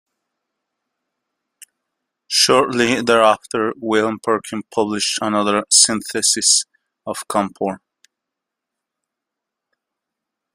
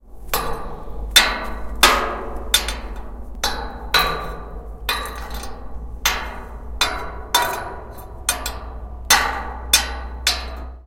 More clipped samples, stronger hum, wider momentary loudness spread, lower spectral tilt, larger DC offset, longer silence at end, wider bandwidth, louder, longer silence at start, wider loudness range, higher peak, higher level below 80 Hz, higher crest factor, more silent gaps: neither; neither; second, 13 LU vs 20 LU; about the same, -1.5 dB/octave vs -1 dB/octave; neither; first, 2.75 s vs 0 s; about the same, 16 kHz vs 17 kHz; first, -16 LUFS vs -20 LUFS; first, 2.3 s vs 0.05 s; first, 12 LU vs 5 LU; about the same, 0 dBFS vs 0 dBFS; second, -62 dBFS vs -32 dBFS; about the same, 20 dB vs 22 dB; neither